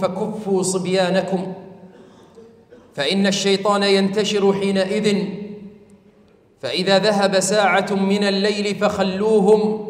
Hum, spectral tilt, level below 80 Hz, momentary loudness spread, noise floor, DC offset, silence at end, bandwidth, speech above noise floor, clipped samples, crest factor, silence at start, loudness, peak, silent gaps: none; -4.5 dB/octave; -60 dBFS; 10 LU; -53 dBFS; under 0.1%; 0 s; 14.5 kHz; 35 dB; under 0.1%; 16 dB; 0 s; -18 LUFS; -4 dBFS; none